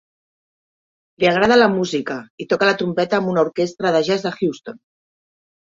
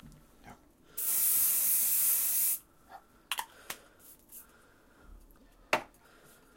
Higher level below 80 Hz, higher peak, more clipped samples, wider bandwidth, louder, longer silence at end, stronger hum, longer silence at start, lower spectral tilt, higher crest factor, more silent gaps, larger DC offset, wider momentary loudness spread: first, -58 dBFS vs -64 dBFS; first, -2 dBFS vs -10 dBFS; neither; second, 7.8 kHz vs 16.5 kHz; first, -18 LUFS vs -27 LUFS; first, 0.9 s vs 0.7 s; neither; first, 1.2 s vs 0.05 s; first, -5.5 dB/octave vs 0.5 dB/octave; second, 18 dB vs 24 dB; first, 2.30-2.38 s vs none; neither; second, 12 LU vs 23 LU